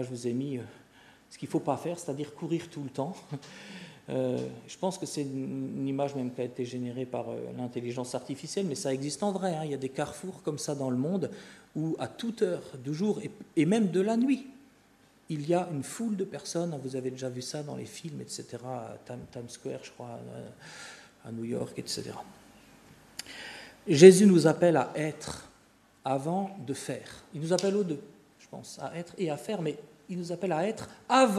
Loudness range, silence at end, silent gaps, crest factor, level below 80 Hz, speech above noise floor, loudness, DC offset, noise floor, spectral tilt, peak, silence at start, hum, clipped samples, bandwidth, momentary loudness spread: 16 LU; 0 s; none; 28 dB; -70 dBFS; 32 dB; -30 LUFS; under 0.1%; -62 dBFS; -5.5 dB/octave; -2 dBFS; 0 s; none; under 0.1%; 13.5 kHz; 17 LU